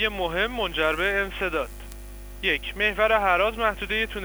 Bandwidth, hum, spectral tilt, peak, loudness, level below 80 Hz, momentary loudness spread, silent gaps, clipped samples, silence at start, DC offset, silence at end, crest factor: over 20 kHz; 50 Hz at -40 dBFS; -4 dB/octave; -8 dBFS; -24 LUFS; -40 dBFS; 16 LU; none; under 0.1%; 0 s; under 0.1%; 0 s; 16 dB